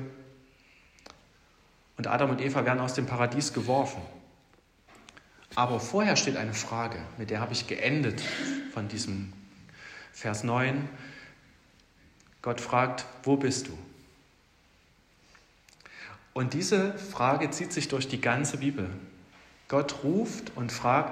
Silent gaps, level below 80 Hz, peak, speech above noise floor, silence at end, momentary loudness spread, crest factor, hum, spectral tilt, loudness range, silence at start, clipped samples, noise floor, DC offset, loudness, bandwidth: none; -64 dBFS; -10 dBFS; 34 dB; 0 s; 18 LU; 20 dB; none; -4.5 dB/octave; 5 LU; 0 s; under 0.1%; -63 dBFS; under 0.1%; -30 LUFS; 14.5 kHz